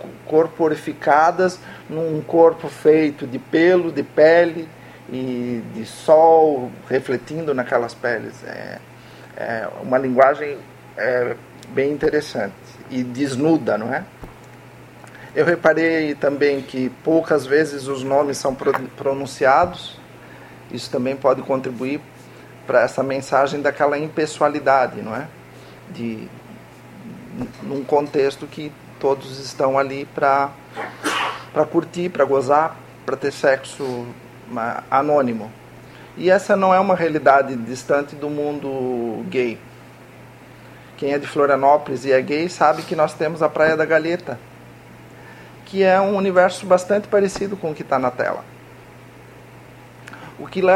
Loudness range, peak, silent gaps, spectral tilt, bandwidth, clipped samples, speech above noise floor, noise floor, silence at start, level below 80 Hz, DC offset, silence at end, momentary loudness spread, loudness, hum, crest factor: 7 LU; 0 dBFS; none; -5.5 dB/octave; 16 kHz; under 0.1%; 24 dB; -42 dBFS; 0 s; -58 dBFS; under 0.1%; 0 s; 17 LU; -19 LUFS; none; 20 dB